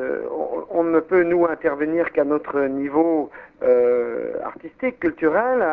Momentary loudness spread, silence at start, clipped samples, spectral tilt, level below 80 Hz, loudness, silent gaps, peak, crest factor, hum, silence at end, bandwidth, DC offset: 9 LU; 0 s; under 0.1%; -10 dB/octave; -58 dBFS; -21 LUFS; none; -6 dBFS; 14 dB; none; 0 s; 3.7 kHz; under 0.1%